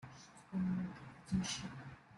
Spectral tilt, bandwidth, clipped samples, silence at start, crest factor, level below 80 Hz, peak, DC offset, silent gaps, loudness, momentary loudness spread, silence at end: -5 dB/octave; 11.5 kHz; under 0.1%; 0 s; 16 dB; -64 dBFS; -26 dBFS; under 0.1%; none; -41 LUFS; 16 LU; 0 s